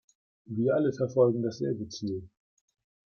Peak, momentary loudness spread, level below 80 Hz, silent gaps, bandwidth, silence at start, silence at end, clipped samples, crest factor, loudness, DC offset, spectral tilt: -12 dBFS; 11 LU; -70 dBFS; none; 7 kHz; 0.5 s; 0.85 s; under 0.1%; 18 dB; -29 LUFS; under 0.1%; -7.5 dB/octave